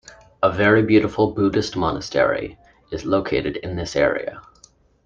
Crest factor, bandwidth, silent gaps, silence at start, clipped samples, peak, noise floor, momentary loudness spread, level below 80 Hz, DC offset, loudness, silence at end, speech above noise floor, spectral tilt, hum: 18 dB; 7.6 kHz; none; 0.4 s; under 0.1%; -2 dBFS; -54 dBFS; 12 LU; -46 dBFS; under 0.1%; -20 LUFS; 0.65 s; 34 dB; -6 dB/octave; none